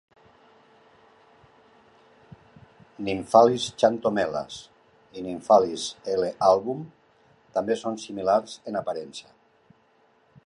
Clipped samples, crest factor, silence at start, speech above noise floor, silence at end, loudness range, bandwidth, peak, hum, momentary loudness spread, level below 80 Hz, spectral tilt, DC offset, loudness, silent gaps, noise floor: under 0.1%; 24 dB; 3 s; 39 dB; 1.25 s; 7 LU; 11.5 kHz; -2 dBFS; none; 18 LU; -64 dBFS; -4.5 dB/octave; under 0.1%; -24 LUFS; none; -63 dBFS